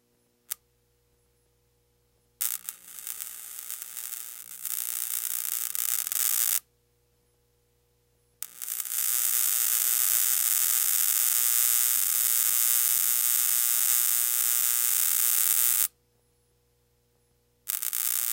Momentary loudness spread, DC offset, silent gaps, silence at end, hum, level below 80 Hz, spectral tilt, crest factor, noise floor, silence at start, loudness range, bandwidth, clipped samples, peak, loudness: 16 LU; under 0.1%; none; 0 s; 60 Hz at -75 dBFS; -76 dBFS; 4.5 dB/octave; 26 dB; -69 dBFS; 0.5 s; 14 LU; 17.5 kHz; under 0.1%; -2 dBFS; -23 LUFS